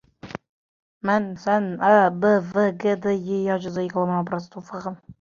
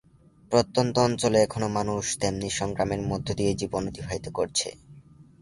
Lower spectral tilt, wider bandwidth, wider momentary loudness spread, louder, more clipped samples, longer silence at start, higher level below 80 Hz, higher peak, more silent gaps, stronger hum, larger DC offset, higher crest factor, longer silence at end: first, -7.5 dB/octave vs -4.5 dB/octave; second, 7.2 kHz vs 11.5 kHz; first, 18 LU vs 8 LU; first, -22 LUFS vs -26 LUFS; neither; second, 0.25 s vs 0.5 s; second, -62 dBFS vs -50 dBFS; about the same, -2 dBFS vs -4 dBFS; first, 0.49-1.01 s vs none; neither; neither; about the same, 20 dB vs 22 dB; about the same, 0.1 s vs 0.2 s